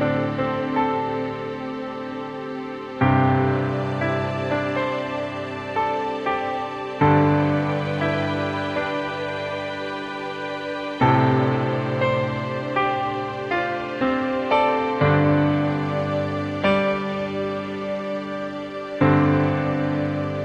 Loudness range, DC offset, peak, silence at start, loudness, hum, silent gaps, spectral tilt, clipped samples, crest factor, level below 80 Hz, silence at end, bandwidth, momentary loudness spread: 3 LU; under 0.1%; -4 dBFS; 0 s; -23 LUFS; none; none; -8 dB/octave; under 0.1%; 18 dB; -52 dBFS; 0 s; 8.4 kHz; 11 LU